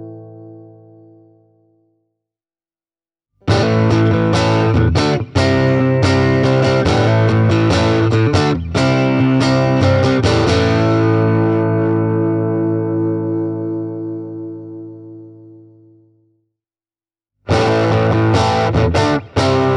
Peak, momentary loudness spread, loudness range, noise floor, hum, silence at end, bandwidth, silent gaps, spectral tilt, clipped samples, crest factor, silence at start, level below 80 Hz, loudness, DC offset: -2 dBFS; 12 LU; 11 LU; under -90 dBFS; none; 0 s; 10 kHz; none; -7 dB/octave; under 0.1%; 14 dB; 0 s; -36 dBFS; -15 LUFS; under 0.1%